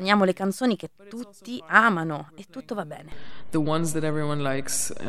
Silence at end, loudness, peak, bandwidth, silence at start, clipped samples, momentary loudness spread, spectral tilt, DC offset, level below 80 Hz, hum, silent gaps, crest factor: 0 s; -25 LUFS; -2 dBFS; 15.5 kHz; 0 s; under 0.1%; 20 LU; -4.5 dB/octave; under 0.1%; -56 dBFS; none; none; 24 dB